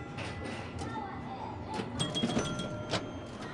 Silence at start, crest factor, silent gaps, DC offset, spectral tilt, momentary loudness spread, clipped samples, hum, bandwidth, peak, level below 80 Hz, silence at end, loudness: 0 s; 18 dB; none; under 0.1%; -4.5 dB/octave; 9 LU; under 0.1%; none; 11.5 kHz; -18 dBFS; -56 dBFS; 0 s; -36 LUFS